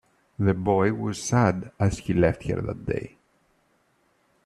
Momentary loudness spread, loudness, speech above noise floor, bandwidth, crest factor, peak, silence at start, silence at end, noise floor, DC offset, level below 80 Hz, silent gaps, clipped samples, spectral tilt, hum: 8 LU; -25 LUFS; 43 dB; 12 kHz; 18 dB; -8 dBFS; 0.4 s; 1.4 s; -67 dBFS; under 0.1%; -48 dBFS; none; under 0.1%; -6.5 dB/octave; none